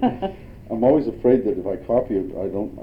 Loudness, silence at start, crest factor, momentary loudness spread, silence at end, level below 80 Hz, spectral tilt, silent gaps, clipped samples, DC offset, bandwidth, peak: -22 LUFS; 0 s; 18 dB; 12 LU; 0 s; -44 dBFS; -10 dB/octave; none; under 0.1%; under 0.1%; 5.2 kHz; -4 dBFS